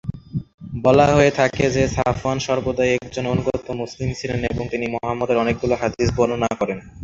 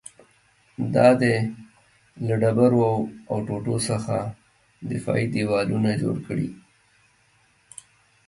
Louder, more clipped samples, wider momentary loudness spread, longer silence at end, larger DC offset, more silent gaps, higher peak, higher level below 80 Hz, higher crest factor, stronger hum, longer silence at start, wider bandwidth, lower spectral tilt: first, -20 LUFS vs -23 LUFS; neither; second, 11 LU vs 21 LU; second, 0 s vs 1.7 s; neither; first, 0.54-0.58 s vs none; first, 0 dBFS vs -4 dBFS; first, -40 dBFS vs -58 dBFS; about the same, 20 dB vs 20 dB; neither; second, 0.05 s vs 0.8 s; second, 7.8 kHz vs 11.5 kHz; about the same, -6 dB/octave vs -6.5 dB/octave